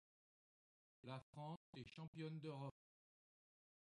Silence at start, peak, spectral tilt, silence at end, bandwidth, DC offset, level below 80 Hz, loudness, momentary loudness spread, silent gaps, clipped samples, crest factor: 1.05 s; -38 dBFS; -7.5 dB/octave; 1.2 s; 10 kHz; under 0.1%; -86 dBFS; -55 LUFS; 6 LU; 1.23-1.33 s, 1.57-1.73 s, 2.08-2.13 s; under 0.1%; 20 dB